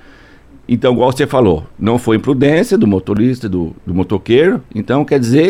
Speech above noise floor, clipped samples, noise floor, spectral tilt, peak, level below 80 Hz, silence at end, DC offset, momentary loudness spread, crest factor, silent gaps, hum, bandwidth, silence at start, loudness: 28 dB; under 0.1%; -41 dBFS; -7 dB/octave; 0 dBFS; -40 dBFS; 0 s; under 0.1%; 8 LU; 12 dB; none; none; 15.5 kHz; 0.7 s; -14 LUFS